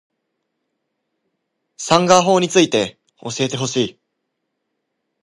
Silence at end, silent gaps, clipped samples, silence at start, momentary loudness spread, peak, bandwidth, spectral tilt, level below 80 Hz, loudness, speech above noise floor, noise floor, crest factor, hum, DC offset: 1.3 s; none; under 0.1%; 1.8 s; 15 LU; 0 dBFS; 11.5 kHz; -4 dB/octave; -62 dBFS; -16 LUFS; 59 dB; -75 dBFS; 20 dB; none; under 0.1%